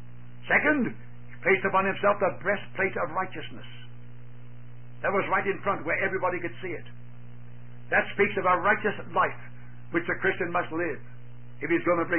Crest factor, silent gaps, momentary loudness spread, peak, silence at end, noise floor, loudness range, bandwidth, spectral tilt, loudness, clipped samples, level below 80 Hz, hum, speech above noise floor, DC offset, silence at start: 18 dB; none; 24 LU; -10 dBFS; 0 s; -47 dBFS; 4 LU; 3.3 kHz; -10 dB/octave; -27 LUFS; under 0.1%; -58 dBFS; 60 Hz at -45 dBFS; 20 dB; 1%; 0 s